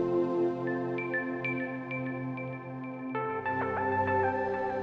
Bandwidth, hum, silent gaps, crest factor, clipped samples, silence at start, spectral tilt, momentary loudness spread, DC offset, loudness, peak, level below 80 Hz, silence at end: 6.2 kHz; none; none; 14 dB; under 0.1%; 0 s; -9 dB/octave; 9 LU; under 0.1%; -32 LUFS; -16 dBFS; -66 dBFS; 0 s